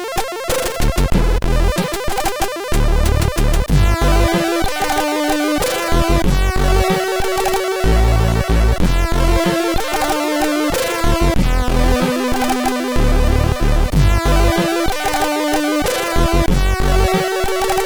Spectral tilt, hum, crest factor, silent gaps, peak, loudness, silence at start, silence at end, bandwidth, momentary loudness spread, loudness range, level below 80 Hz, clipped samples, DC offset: -5 dB/octave; none; 12 dB; none; -2 dBFS; -17 LUFS; 0 s; 0 s; over 20 kHz; 3 LU; 1 LU; -18 dBFS; under 0.1%; 0.9%